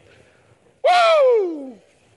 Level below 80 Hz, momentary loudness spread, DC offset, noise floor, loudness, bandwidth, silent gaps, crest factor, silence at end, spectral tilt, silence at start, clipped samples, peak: -76 dBFS; 19 LU; under 0.1%; -56 dBFS; -16 LUFS; 11.5 kHz; none; 14 dB; 0.45 s; -2 dB/octave; 0.85 s; under 0.1%; -6 dBFS